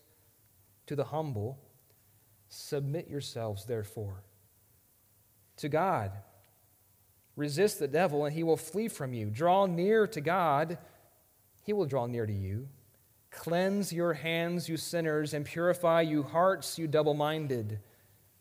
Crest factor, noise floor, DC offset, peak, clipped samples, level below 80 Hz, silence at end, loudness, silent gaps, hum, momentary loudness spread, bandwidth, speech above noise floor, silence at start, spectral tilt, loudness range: 18 dB; -66 dBFS; under 0.1%; -16 dBFS; under 0.1%; -74 dBFS; 0.6 s; -32 LUFS; none; none; 14 LU; 16.5 kHz; 35 dB; 0.9 s; -5.5 dB/octave; 9 LU